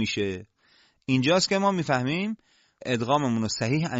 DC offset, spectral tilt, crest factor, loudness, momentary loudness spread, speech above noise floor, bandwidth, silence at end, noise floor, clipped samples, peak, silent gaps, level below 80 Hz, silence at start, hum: under 0.1%; -5 dB/octave; 16 dB; -25 LUFS; 16 LU; 37 dB; 8 kHz; 0 s; -62 dBFS; under 0.1%; -10 dBFS; none; -58 dBFS; 0 s; none